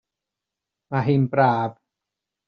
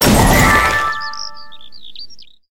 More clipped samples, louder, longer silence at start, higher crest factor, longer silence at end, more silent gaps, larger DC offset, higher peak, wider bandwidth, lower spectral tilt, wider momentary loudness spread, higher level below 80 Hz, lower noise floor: neither; second, -22 LUFS vs -12 LUFS; first, 0.9 s vs 0 s; about the same, 20 dB vs 16 dB; first, 0.75 s vs 0 s; neither; second, under 0.1% vs 3%; second, -4 dBFS vs 0 dBFS; second, 5.2 kHz vs 17.5 kHz; first, -7 dB/octave vs -4 dB/octave; second, 10 LU vs 24 LU; second, -62 dBFS vs -24 dBFS; first, -86 dBFS vs -40 dBFS